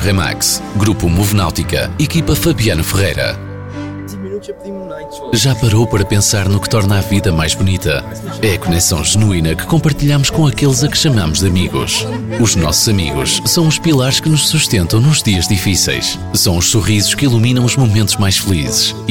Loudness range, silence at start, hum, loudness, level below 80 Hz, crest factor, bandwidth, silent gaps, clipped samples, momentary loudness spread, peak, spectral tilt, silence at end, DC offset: 4 LU; 0 s; none; -13 LUFS; -30 dBFS; 12 dB; 19 kHz; none; under 0.1%; 8 LU; -2 dBFS; -4 dB/octave; 0 s; 1%